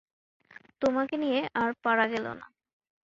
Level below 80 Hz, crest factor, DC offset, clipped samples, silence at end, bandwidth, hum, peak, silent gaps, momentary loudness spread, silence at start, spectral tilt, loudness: -68 dBFS; 20 dB; under 0.1%; under 0.1%; 0.6 s; 7.8 kHz; none; -10 dBFS; none; 9 LU; 0.8 s; -5.5 dB/octave; -29 LUFS